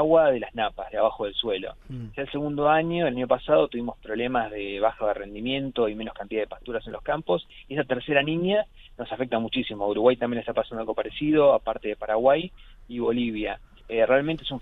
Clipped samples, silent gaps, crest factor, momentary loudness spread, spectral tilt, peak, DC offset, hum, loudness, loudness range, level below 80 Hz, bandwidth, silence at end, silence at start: under 0.1%; none; 20 dB; 11 LU; -8.5 dB/octave; -4 dBFS; under 0.1%; none; -25 LUFS; 4 LU; -50 dBFS; 4.1 kHz; 0 s; 0 s